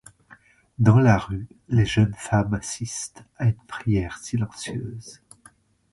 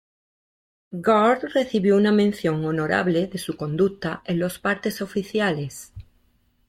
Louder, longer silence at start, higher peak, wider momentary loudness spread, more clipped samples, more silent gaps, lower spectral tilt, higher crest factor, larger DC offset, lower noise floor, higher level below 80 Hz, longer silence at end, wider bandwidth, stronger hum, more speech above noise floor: about the same, -23 LUFS vs -22 LUFS; about the same, 0.8 s vs 0.9 s; first, -4 dBFS vs -8 dBFS; first, 16 LU vs 12 LU; neither; neither; about the same, -6 dB/octave vs -6 dB/octave; about the same, 20 dB vs 16 dB; neither; second, -56 dBFS vs -64 dBFS; first, -44 dBFS vs -56 dBFS; first, 0.8 s vs 0.65 s; second, 11.5 kHz vs 16 kHz; neither; second, 33 dB vs 42 dB